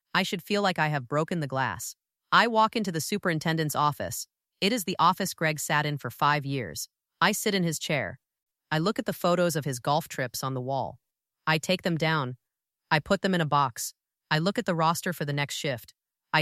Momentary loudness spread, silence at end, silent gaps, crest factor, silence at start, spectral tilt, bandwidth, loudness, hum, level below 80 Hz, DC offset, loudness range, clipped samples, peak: 10 LU; 0 s; 8.42-8.46 s; 22 dB; 0.15 s; -4.5 dB/octave; 16 kHz; -27 LUFS; none; -64 dBFS; under 0.1%; 2 LU; under 0.1%; -6 dBFS